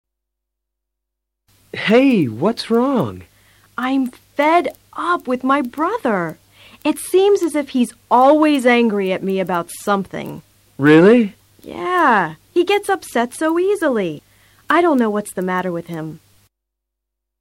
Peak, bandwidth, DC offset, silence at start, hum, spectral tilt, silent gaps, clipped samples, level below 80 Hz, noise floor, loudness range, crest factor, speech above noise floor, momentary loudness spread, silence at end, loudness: -2 dBFS; 16.5 kHz; under 0.1%; 1.75 s; none; -5.5 dB/octave; none; under 0.1%; -60 dBFS; -80 dBFS; 4 LU; 14 dB; 63 dB; 14 LU; 1.25 s; -17 LUFS